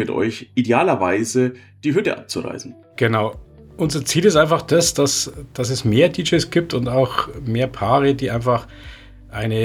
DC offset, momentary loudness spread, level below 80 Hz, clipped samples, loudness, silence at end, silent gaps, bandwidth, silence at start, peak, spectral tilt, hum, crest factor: under 0.1%; 11 LU; -44 dBFS; under 0.1%; -19 LUFS; 0 s; none; 16.5 kHz; 0 s; -2 dBFS; -4.5 dB/octave; none; 16 dB